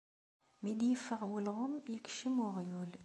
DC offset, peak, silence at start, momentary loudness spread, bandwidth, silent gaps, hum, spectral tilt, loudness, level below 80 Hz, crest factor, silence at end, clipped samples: under 0.1%; -26 dBFS; 0.6 s; 8 LU; 11.5 kHz; none; none; -5.5 dB/octave; -39 LUFS; -84 dBFS; 14 dB; 0 s; under 0.1%